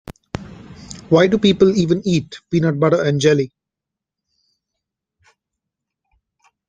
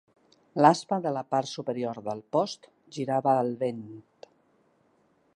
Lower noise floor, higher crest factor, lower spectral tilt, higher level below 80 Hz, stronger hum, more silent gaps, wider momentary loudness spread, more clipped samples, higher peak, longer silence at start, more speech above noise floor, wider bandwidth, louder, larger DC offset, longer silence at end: first, -85 dBFS vs -67 dBFS; second, 18 dB vs 26 dB; about the same, -6.5 dB/octave vs -6 dB/octave; first, -50 dBFS vs -78 dBFS; neither; neither; about the same, 19 LU vs 20 LU; neither; about the same, -2 dBFS vs -4 dBFS; second, 0.35 s vs 0.55 s; first, 69 dB vs 40 dB; second, 9.4 kHz vs 11 kHz; first, -16 LUFS vs -28 LUFS; neither; first, 3.2 s vs 1.35 s